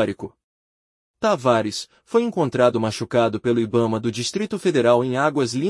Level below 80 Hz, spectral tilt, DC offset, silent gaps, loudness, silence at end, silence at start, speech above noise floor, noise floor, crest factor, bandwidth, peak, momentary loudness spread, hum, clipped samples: -64 dBFS; -5.5 dB/octave; under 0.1%; 0.44-1.14 s; -21 LUFS; 0 s; 0 s; over 70 dB; under -90 dBFS; 18 dB; 12 kHz; -4 dBFS; 7 LU; none; under 0.1%